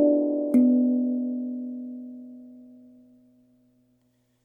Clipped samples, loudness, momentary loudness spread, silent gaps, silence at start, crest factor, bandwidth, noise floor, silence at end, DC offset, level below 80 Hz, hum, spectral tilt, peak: under 0.1%; -24 LUFS; 22 LU; none; 0 s; 16 dB; 2.4 kHz; -68 dBFS; 1.8 s; under 0.1%; -78 dBFS; 60 Hz at -70 dBFS; -9.5 dB/octave; -10 dBFS